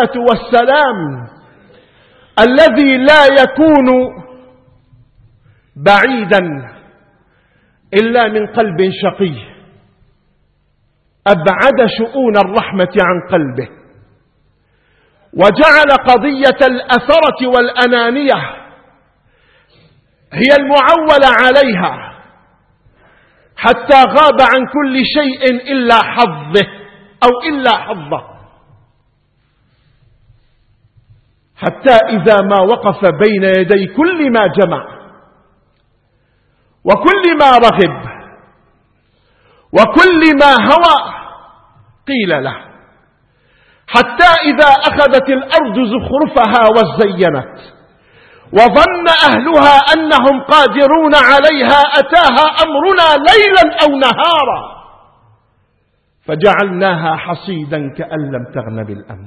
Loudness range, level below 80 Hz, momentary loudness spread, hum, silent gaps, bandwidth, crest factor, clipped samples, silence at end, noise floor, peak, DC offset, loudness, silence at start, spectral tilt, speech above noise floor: 8 LU; -42 dBFS; 14 LU; none; none; 11 kHz; 12 dB; 0.7%; 0 s; -59 dBFS; 0 dBFS; under 0.1%; -9 LUFS; 0 s; -5.5 dB/octave; 50 dB